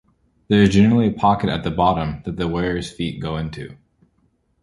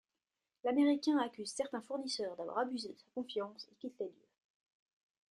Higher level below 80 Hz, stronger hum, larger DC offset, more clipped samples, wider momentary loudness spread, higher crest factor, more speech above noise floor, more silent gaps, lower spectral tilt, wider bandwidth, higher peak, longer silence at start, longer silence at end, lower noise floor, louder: first, -40 dBFS vs -86 dBFS; neither; neither; neither; about the same, 13 LU vs 15 LU; about the same, 18 dB vs 18 dB; second, 45 dB vs over 53 dB; neither; first, -7 dB/octave vs -3.5 dB/octave; about the same, 11.5 kHz vs 11.5 kHz; first, -2 dBFS vs -20 dBFS; second, 0.5 s vs 0.65 s; second, 0.9 s vs 1.2 s; second, -64 dBFS vs under -90 dBFS; first, -19 LUFS vs -38 LUFS